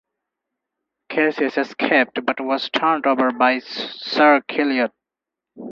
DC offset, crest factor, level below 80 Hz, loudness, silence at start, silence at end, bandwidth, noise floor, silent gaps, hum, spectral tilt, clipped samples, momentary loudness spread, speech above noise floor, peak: under 0.1%; 20 dB; -72 dBFS; -19 LUFS; 1.1 s; 0 s; 7.2 kHz; -86 dBFS; none; none; -5 dB/octave; under 0.1%; 10 LU; 67 dB; 0 dBFS